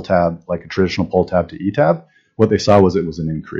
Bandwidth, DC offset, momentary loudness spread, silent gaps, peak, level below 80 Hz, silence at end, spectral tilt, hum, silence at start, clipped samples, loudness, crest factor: 7.8 kHz; under 0.1%; 11 LU; none; 0 dBFS; -44 dBFS; 0 s; -7 dB/octave; none; 0 s; under 0.1%; -17 LUFS; 16 dB